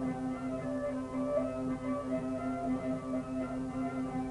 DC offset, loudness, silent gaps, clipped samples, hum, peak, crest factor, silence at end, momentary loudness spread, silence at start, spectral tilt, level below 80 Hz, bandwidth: under 0.1%; -36 LUFS; none; under 0.1%; none; -20 dBFS; 16 dB; 0 s; 3 LU; 0 s; -7.5 dB/octave; -56 dBFS; 11 kHz